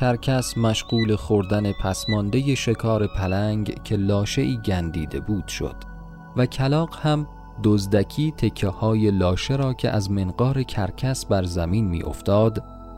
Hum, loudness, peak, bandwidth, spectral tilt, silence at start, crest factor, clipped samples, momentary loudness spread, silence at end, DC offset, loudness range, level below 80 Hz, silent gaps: none; -23 LUFS; -6 dBFS; 15 kHz; -6.5 dB/octave; 0 s; 16 dB; under 0.1%; 7 LU; 0 s; under 0.1%; 3 LU; -38 dBFS; none